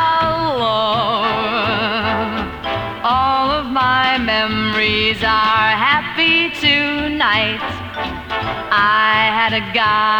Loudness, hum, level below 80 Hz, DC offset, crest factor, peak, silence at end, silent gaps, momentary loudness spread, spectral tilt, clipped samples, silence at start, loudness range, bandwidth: -15 LUFS; none; -40 dBFS; under 0.1%; 14 dB; -2 dBFS; 0 s; none; 9 LU; -5 dB/octave; under 0.1%; 0 s; 3 LU; over 20 kHz